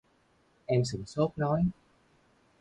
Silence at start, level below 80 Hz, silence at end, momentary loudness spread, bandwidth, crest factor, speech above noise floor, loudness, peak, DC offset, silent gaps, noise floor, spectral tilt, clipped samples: 0.7 s; -56 dBFS; 0.9 s; 5 LU; 10.5 kHz; 18 dB; 39 dB; -30 LUFS; -14 dBFS; under 0.1%; none; -68 dBFS; -7 dB/octave; under 0.1%